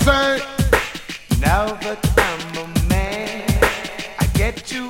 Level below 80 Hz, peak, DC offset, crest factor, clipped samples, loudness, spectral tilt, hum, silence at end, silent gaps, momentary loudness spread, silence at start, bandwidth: -26 dBFS; 0 dBFS; under 0.1%; 18 dB; under 0.1%; -19 LUFS; -5 dB/octave; none; 0 s; none; 8 LU; 0 s; 17 kHz